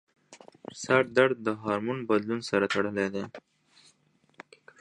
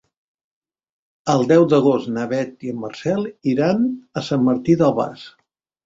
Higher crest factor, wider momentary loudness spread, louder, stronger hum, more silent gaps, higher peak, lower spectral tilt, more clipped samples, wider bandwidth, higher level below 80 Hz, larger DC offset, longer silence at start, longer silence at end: about the same, 22 dB vs 18 dB; first, 17 LU vs 13 LU; second, -27 LUFS vs -19 LUFS; neither; neither; second, -6 dBFS vs -2 dBFS; second, -5 dB/octave vs -7 dB/octave; neither; first, 11 kHz vs 7.8 kHz; second, -68 dBFS vs -58 dBFS; neither; second, 0.3 s vs 1.25 s; first, 1.4 s vs 0.55 s